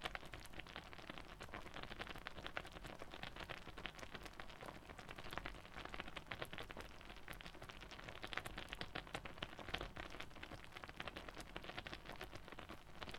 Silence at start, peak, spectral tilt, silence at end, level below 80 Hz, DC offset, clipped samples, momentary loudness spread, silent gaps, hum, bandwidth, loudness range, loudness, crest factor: 0 s; -22 dBFS; -4 dB/octave; 0 s; -62 dBFS; under 0.1%; under 0.1%; 7 LU; none; none; 20 kHz; 2 LU; -52 LUFS; 30 dB